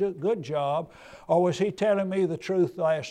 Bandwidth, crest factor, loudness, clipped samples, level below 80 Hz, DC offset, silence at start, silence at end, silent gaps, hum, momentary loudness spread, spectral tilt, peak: 10 kHz; 14 dB; -26 LUFS; under 0.1%; -66 dBFS; under 0.1%; 0 s; 0 s; none; none; 6 LU; -6.5 dB/octave; -12 dBFS